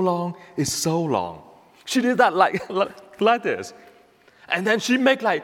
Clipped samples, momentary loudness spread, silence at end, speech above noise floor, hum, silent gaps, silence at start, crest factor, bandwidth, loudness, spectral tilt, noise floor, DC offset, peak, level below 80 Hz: under 0.1%; 11 LU; 0 s; 33 dB; none; none; 0 s; 20 dB; 16.5 kHz; -22 LUFS; -4 dB/octave; -54 dBFS; under 0.1%; -4 dBFS; -62 dBFS